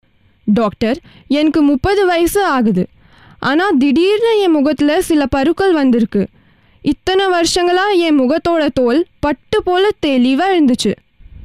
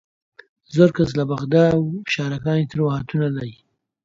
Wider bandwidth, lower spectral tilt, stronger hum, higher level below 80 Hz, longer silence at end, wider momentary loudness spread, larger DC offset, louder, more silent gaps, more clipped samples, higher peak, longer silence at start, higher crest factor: first, 15.5 kHz vs 7.6 kHz; second, -5 dB/octave vs -7.5 dB/octave; neither; first, -38 dBFS vs -52 dBFS; second, 0.05 s vs 0.5 s; about the same, 7 LU vs 8 LU; first, 0.4% vs under 0.1%; first, -14 LUFS vs -20 LUFS; neither; neither; second, -6 dBFS vs 0 dBFS; second, 0.45 s vs 0.7 s; second, 8 dB vs 20 dB